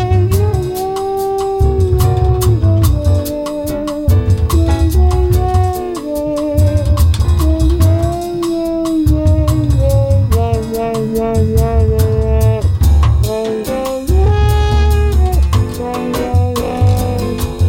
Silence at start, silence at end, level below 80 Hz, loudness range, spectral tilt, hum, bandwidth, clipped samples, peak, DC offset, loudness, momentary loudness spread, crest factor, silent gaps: 0 s; 0 s; -16 dBFS; 1 LU; -7.5 dB/octave; none; 16.5 kHz; under 0.1%; -2 dBFS; under 0.1%; -14 LUFS; 6 LU; 10 dB; none